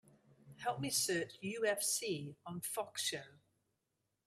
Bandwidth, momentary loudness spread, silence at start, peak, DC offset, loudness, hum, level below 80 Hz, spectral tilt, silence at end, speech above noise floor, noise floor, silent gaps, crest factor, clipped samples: 15.5 kHz; 10 LU; 0.45 s; -20 dBFS; under 0.1%; -38 LUFS; none; -80 dBFS; -2.5 dB/octave; 0.95 s; 46 dB; -86 dBFS; none; 20 dB; under 0.1%